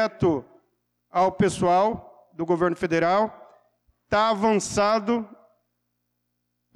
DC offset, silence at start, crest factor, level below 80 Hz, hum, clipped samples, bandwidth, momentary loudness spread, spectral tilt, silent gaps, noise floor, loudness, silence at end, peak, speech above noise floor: under 0.1%; 0 s; 12 dB; -54 dBFS; 60 Hz at -55 dBFS; under 0.1%; 12.5 kHz; 9 LU; -5.5 dB/octave; none; -77 dBFS; -23 LUFS; 1.4 s; -12 dBFS; 54 dB